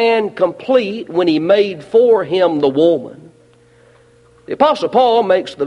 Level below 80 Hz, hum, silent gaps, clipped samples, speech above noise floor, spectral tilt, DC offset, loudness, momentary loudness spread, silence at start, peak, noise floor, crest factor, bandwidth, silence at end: -60 dBFS; none; none; under 0.1%; 35 dB; -6.5 dB/octave; under 0.1%; -14 LUFS; 6 LU; 0 s; 0 dBFS; -49 dBFS; 14 dB; 10.5 kHz; 0 s